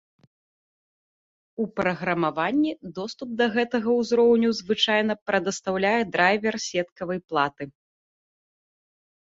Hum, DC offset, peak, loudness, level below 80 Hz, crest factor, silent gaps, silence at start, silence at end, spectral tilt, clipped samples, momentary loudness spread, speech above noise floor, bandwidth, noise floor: none; under 0.1%; -6 dBFS; -24 LUFS; -64 dBFS; 20 dB; 5.22-5.26 s, 6.92-6.96 s; 1.6 s; 1.65 s; -4.5 dB/octave; under 0.1%; 12 LU; over 66 dB; 7.8 kHz; under -90 dBFS